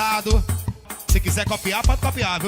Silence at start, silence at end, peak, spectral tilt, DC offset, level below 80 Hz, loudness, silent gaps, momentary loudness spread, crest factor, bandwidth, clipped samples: 0 s; 0 s; -6 dBFS; -4 dB/octave; under 0.1%; -24 dBFS; -22 LUFS; none; 8 LU; 14 dB; 19 kHz; under 0.1%